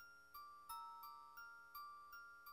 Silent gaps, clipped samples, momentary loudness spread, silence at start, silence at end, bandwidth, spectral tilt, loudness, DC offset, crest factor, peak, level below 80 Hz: none; under 0.1%; 5 LU; 0 s; 0 s; 16 kHz; -0.5 dB/octave; -57 LUFS; under 0.1%; 16 dB; -42 dBFS; -84 dBFS